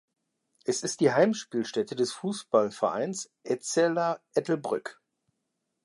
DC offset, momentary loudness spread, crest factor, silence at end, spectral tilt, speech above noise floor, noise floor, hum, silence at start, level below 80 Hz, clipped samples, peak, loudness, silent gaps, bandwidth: under 0.1%; 9 LU; 20 dB; 0.95 s; -4.5 dB/octave; 53 dB; -81 dBFS; none; 0.65 s; -80 dBFS; under 0.1%; -8 dBFS; -28 LUFS; none; 11.5 kHz